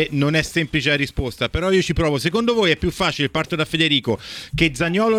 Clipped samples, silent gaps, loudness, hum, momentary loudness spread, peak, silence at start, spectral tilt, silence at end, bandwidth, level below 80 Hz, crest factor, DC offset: under 0.1%; none; -19 LUFS; none; 6 LU; -2 dBFS; 0 s; -5 dB/octave; 0 s; 16 kHz; -36 dBFS; 18 dB; under 0.1%